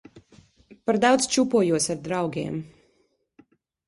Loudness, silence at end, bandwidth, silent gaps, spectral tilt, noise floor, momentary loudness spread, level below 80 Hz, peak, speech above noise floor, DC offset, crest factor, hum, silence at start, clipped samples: -23 LUFS; 1.2 s; 11.5 kHz; none; -4 dB/octave; -68 dBFS; 13 LU; -62 dBFS; -6 dBFS; 45 dB; under 0.1%; 20 dB; none; 0.15 s; under 0.1%